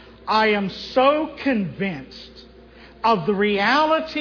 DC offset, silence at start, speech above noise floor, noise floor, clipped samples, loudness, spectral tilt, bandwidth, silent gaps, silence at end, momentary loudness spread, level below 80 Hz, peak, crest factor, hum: under 0.1%; 0 s; 25 dB; -46 dBFS; under 0.1%; -20 LUFS; -6 dB/octave; 5.4 kHz; none; 0 s; 10 LU; -52 dBFS; -6 dBFS; 16 dB; none